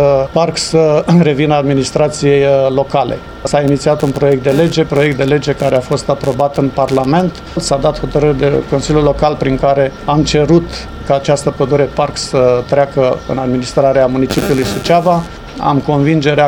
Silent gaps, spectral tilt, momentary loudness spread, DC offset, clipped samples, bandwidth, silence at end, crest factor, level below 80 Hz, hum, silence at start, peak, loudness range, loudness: none; -6 dB/octave; 5 LU; under 0.1%; under 0.1%; 17 kHz; 0 s; 12 dB; -32 dBFS; none; 0 s; 0 dBFS; 2 LU; -12 LUFS